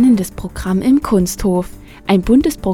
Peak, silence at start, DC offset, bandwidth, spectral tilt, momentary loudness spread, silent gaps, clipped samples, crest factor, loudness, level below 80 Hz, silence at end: 0 dBFS; 0 s; under 0.1%; 17 kHz; -6.5 dB/octave; 12 LU; none; under 0.1%; 14 dB; -15 LUFS; -32 dBFS; 0 s